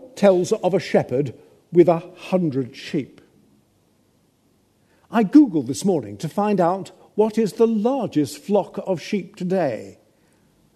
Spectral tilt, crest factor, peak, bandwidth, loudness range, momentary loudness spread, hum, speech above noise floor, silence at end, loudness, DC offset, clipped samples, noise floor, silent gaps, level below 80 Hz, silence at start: -7 dB/octave; 20 dB; -2 dBFS; 13.5 kHz; 4 LU; 11 LU; none; 42 dB; 0.85 s; -21 LUFS; under 0.1%; under 0.1%; -62 dBFS; none; -68 dBFS; 0 s